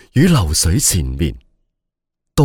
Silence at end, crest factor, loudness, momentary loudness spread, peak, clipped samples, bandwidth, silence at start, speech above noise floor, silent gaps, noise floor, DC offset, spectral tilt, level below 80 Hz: 0 s; 14 dB; -15 LUFS; 10 LU; -2 dBFS; under 0.1%; 19 kHz; 0.15 s; 64 dB; none; -78 dBFS; under 0.1%; -4.5 dB/octave; -26 dBFS